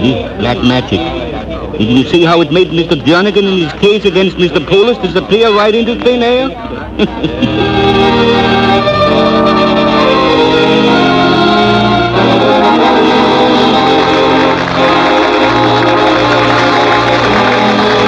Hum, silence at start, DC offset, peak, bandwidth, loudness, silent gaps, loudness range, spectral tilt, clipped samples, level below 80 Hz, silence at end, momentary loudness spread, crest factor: none; 0 s; under 0.1%; 0 dBFS; 9.8 kHz; -9 LUFS; none; 3 LU; -6 dB/octave; 0.2%; -32 dBFS; 0 s; 6 LU; 8 dB